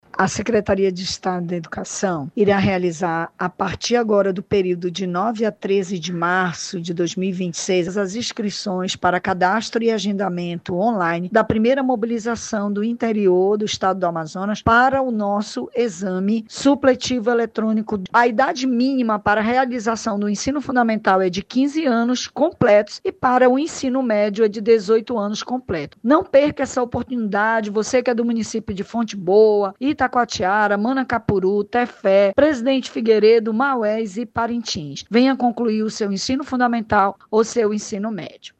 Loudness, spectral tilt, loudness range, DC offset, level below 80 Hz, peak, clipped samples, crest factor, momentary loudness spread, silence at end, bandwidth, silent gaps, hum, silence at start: -19 LUFS; -5 dB/octave; 3 LU; under 0.1%; -50 dBFS; -2 dBFS; under 0.1%; 16 dB; 8 LU; 0.1 s; 8.8 kHz; none; none; 0.15 s